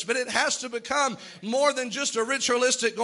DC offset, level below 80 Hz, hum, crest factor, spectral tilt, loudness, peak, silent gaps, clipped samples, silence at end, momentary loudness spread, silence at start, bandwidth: under 0.1%; -70 dBFS; none; 20 dB; -1 dB/octave; -25 LUFS; -6 dBFS; none; under 0.1%; 0 s; 6 LU; 0 s; 11.5 kHz